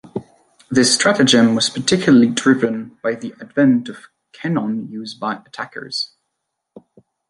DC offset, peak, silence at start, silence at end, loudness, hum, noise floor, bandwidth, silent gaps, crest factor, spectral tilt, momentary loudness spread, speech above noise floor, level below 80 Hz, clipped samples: under 0.1%; 0 dBFS; 0.15 s; 1.25 s; -17 LUFS; none; -76 dBFS; 11.5 kHz; none; 18 dB; -4 dB/octave; 16 LU; 60 dB; -58 dBFS; under 0.1%